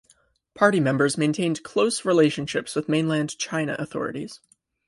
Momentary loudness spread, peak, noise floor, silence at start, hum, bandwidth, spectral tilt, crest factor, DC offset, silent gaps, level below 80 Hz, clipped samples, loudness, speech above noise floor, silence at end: 10 LU; -4 dBFS; -62 dBFS; 0.55 s; none; 11.5 kHz; -5 dB/octave; 20 dB; under 0.1%; none; -64 dBFS; under 0.1%; -23 LUFS; 39 dB; 0.5 s